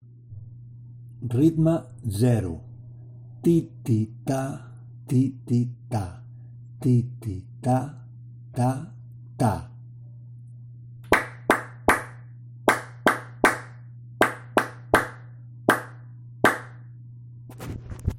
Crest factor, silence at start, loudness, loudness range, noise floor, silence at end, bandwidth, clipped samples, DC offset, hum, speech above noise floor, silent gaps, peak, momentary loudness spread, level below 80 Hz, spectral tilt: 24 dB; 0.3 s; -25 LUFS; 4 LU; -43 dBFS; 0 s; 16 kHz; under 0.1%; under 0.1%; none; 19 dB; none; -2 dBFS; 21 LU; -50 dBFS; -6 dB/octave